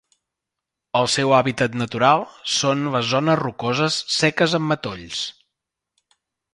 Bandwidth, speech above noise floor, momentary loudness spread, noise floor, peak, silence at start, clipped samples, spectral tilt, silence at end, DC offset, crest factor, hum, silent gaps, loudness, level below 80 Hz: 11.5 kHz; 64 dB; 9 LU; -84 dBFS; -2 dBFS; 0.95 s; under 0.1%; -4 dB/octave; 1.2 s; under 0.1%; 20 dB; none; none; -20 LUFS; -58 dBFS